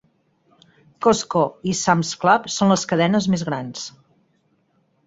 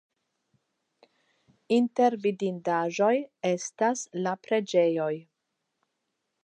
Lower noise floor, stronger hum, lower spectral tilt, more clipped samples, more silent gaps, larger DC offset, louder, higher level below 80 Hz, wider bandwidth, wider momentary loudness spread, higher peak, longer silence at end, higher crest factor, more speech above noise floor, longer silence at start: second, -64 dBFS vs -81 dBFS; neither; about the same, -4.5 dB/octave vs -5 dB/octave; neither; neither; neither; first, -20 LUFS vs -27 LUFS; first, -58 dBFS vs -84 dBFS; second, 8 kHz vs 10 kHz; first, 10 LU vs 7 LU; first, -2 dBFS vs -10 dBFS; about the same, 1.2 s vs 1.25 s; about the same, 20 dB vs 18 dB; second, 45 dB vs 55 dB; second, 1 s vs 1.7 s